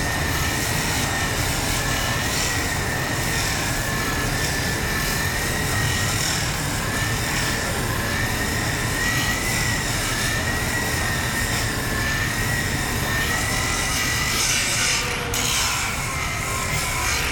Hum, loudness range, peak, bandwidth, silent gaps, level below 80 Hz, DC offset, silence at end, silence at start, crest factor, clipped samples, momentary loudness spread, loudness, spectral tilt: none; 2 LU; -8 dBFS; 19.5 kHz; none; -34 dBFS; under 0.1%; 0 s; 0 s; 14 dB; under 0.1%; 3 LU; -21 LUFS; -2.5 dB/octave